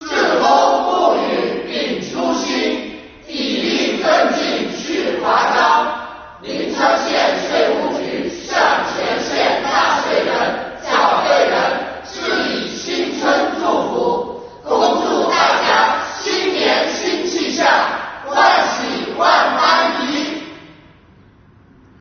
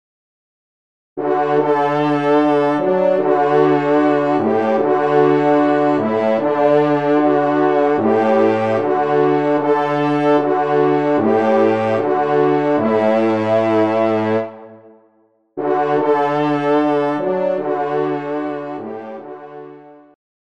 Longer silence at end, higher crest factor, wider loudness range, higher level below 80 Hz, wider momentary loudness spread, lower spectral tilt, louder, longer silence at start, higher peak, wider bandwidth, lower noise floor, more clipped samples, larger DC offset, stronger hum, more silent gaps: first, 1.3 s vs 0.6 s; about the same, 16 dB vs 14 dB; about the same, 3 LU vs 4 LU; first, -52 dBFS vs -66 dBFS; about the same, 10 LU vs 9 LU; second, -0.5 dB/octave vs -8 dB/octave; about the same, -16 LUFS vs -16 LUFS; second, 0 s vs 1.15 s; about the same, 0 dBFS vs -2 dBFS; second, 6.6 kHz vs 7.8 kHz; second, -47 dBFS vs -58 dBFS; neither; second, under 0.1% vs 0.4%; neither; neither